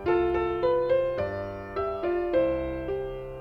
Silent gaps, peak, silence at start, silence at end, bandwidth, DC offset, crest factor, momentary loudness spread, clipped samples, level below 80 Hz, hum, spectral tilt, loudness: none; -14 dBFS; 0 s; 0 s; 5.8 kHz; under 0.1%; 14 dB; 8 LU; under 0.1%; -44 dBFS; none; -8.5 dB/octave; -28 LUFS